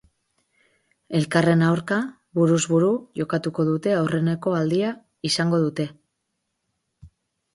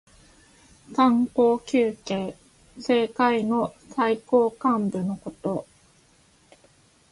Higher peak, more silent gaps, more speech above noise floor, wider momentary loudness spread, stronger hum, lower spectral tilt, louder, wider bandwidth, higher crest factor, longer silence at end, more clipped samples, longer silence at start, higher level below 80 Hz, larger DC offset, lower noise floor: about the same, -6 dBFS vs -8 dBFS; neither; first, 56 dB vs 36 dB; second, 8 LU vs 11 LU; neither; about the same, -6 dB/octave vs -6.5 dB/octave; about the same, -22 LUFS vs -24 LUFS; about the same, 11.5 kHz vs 11.5 kHz; about the same, 18 dB vs 18 dB; second, 0.45 s vs 1.5 s; neither; first, 1.1 s vs 0.9 s; about the same, -62 dBFS vs -62 dBFS; neither; first, -77 dBFS vs -59 dBFS